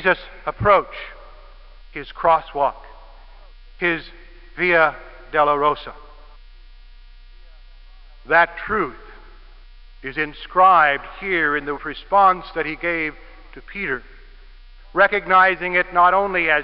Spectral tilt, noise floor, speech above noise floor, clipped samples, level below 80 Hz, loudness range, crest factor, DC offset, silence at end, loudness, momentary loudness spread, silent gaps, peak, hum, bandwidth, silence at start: -9.5 dB/octave; -43 dBFS; 24 dB; under 0.1%; -42 dBFS; 6 LU; 20 dB; 0.1%; 0 s; -19 LUFS; 16 LU; none; -2 dBFS; none; 5.6 kHz; 0 s